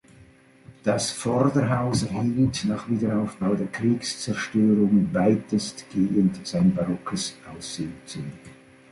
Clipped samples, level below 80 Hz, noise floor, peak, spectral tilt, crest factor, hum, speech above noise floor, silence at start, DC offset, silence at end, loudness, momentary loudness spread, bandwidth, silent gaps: under 0.1%; -52 dBFS; -53 dBFS; -6 dBFS; -6 dB/octave; 18 dB; none; 29 dB; 0.2 s; under 0.1%; 0.4 s; -24 LUFS; 12 LU; 11.5 kHz; none